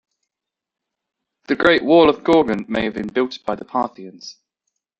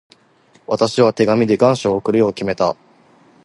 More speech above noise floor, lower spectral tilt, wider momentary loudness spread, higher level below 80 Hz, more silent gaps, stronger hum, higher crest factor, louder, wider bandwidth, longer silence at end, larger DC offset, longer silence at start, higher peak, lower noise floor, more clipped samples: first, 68 dB vs 38 dB; about the same, -6 dB/octave vs -6 dB/octave; first, 22 LU vs 6 LU; about the same, -52 dBFS vs -54 dBFS; neither; neither; about the same, 18 dB vs 16 dB; about the same, -18 LUFS vs -16 LUFS; second, 8 kHz vs 11.5 kHz; about the same, 0.7 s vs 0.7 s; neither; first, 1.5 s vs 0.7 s; about the same, -2 dBFS vs 0 dBFS; first, -85 dBFS vs -53 dBFS; neither